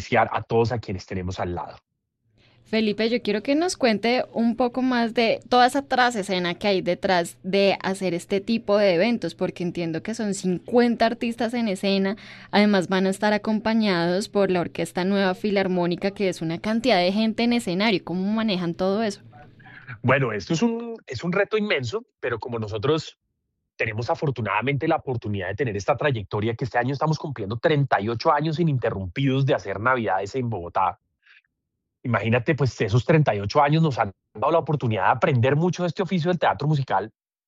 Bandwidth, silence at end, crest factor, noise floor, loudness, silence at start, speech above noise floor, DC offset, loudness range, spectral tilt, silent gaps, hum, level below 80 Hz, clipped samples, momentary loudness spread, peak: 13 kHz; 0.4 s; 16 dB; -81 dBFS; -23 LUFS; 0 s; 58 dB; under 0.1%; 4 LU; -6 dB/octave; none; none; -58 dBFS; under 0.1%; 8 LU; -6 dBFS